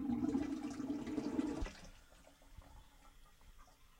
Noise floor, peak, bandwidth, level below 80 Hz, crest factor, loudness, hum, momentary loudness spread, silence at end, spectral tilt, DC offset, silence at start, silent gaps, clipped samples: -63 dBFS; -26 dBFS; 16 kHz; -56 dBFS; 18 dB; -42 LUFS; none; 24 LU; 0.1 s; -6.5 dB/octave; under 0.1%; 0 s; none; under 0.1%